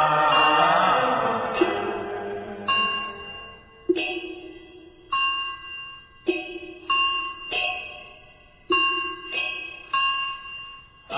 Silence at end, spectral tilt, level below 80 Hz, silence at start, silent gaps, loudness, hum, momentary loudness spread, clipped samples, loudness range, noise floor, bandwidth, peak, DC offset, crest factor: 0 s; -7.5 dB/octave; -58 dBFS; 0 s; none; -23 LUFS; none; 19 LU; under 0.1%; 6 LU; -51 dBFS; 4 kHz; -6 dBFS; under 0.1%; 20 dB